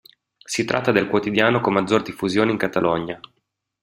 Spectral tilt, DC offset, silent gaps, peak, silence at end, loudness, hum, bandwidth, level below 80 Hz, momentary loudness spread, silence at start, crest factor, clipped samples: -5 dB/octave; under 0.1%; none; -2 dBFS; 0.65 s; -20 LUFS; none; 16 kHz; -56 dBFS; 8 LU; 0.5 s; 20 dB; under 0.1%